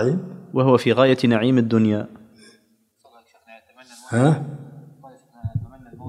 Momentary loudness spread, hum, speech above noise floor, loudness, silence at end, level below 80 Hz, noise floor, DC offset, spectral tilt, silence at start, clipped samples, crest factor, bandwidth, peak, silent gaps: 18 LU; none; 44 dB; -19 LUFS; 0 s; -56 dBFS; -62 dBFS; under 0.1%; -7.5 dB/octave; 0 s; under 0.1%; 20 dB; 12 kHz; -2 dBFS; none